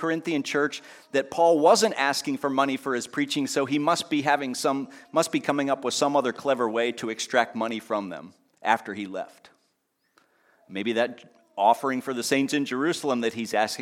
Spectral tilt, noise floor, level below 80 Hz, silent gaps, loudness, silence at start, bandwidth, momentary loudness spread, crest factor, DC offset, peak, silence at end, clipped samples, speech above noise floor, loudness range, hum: -3.5 dB/octave; -73 dBFS; -78 dBFS; none; -25 LUFS; 0 s; 16.5 kHz; 10 LU; 20 dB; under 0.1%; -6 dBFS; 0 s; under 0.1%; 48 dB; 8 LU; none